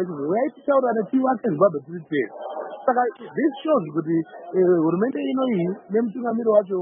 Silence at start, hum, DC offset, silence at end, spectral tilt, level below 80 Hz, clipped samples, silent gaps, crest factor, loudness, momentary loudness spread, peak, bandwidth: 0 s; none; under 0.1%; 0 s; -12 dB/octave; -74 dBFS; under 0.1%; none; 16 dB; -23 LUFS; 7 LU; -4 dBFS; 3.7 kHz